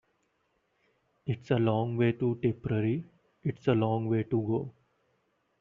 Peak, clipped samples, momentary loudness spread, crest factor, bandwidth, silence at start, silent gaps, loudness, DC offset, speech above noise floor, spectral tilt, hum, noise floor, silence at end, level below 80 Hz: -12 dBFS; under 0.1%; 9 LU; 18 dB; 5.4 kHz; 1.25 s; none; -30 LUFS; under 0.1%; 46 dB; -7.5 dB/octave; none; -75 dBFS; 0.9 s; -64 dBFS